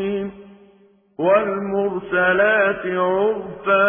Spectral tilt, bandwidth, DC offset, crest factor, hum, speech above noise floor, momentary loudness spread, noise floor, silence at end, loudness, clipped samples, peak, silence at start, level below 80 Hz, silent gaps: -10 dB/octave; 3.6 kHz; under 0.1%; 16 dB; none; 36 dB; 9 LU; -54 dBFS; 0 s; -19 LUFS; under 0.1%; -4 dBFS; 0 s; -56 dBFS; none